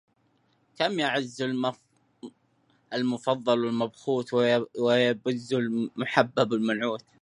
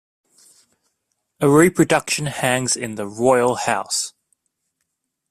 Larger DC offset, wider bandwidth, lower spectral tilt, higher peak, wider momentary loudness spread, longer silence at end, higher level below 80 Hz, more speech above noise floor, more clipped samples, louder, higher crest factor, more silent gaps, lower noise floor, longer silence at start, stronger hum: neither; second, 10.5 kHz vs 15 kHz; first, -5.5 dB/octave vs -4 dB/octave; about the same, -4 dBFS vs -2 dBFS; about the same, 8 LU vs 9 LU; second, 0.25 s vs 1.2 s; second, -74 dBFS vs -58 dBFS; second, 42 dB vs 58 dB; neither; second, -27 LUFS vs -18 LUFS; about the same, 24 dB vs 20 dB; neither; second, -68 dBFS vs -76 dBFS; second, 0.8 s vs 1.4 s; neither